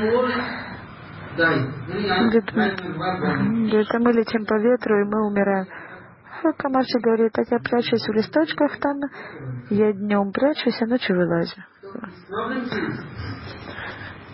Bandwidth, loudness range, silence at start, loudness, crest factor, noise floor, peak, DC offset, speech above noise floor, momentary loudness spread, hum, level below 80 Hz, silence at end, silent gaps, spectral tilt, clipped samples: 5.8 kHz; 3 LU; 0 s; -22 LUFS; 16 dB; -42 dBFS; -6 dBFS; under 0.1%; 21 dB; 16 LU; none; -52 dBFS; 0 s; none; -10.5 dB/octave; under 0.1%